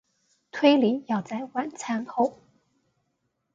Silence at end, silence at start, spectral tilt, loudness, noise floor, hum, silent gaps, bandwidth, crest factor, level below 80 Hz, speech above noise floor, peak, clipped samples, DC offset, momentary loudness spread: 1.2 s; 0.55 s; -5 dB/octave; -25 LUFS; -76 dBFS; none; none; 7.8 kHz; 22 dB; -76 dBFS; 52 dB; -6 dBFS; under 0.1%; under 0.1%; 12 LU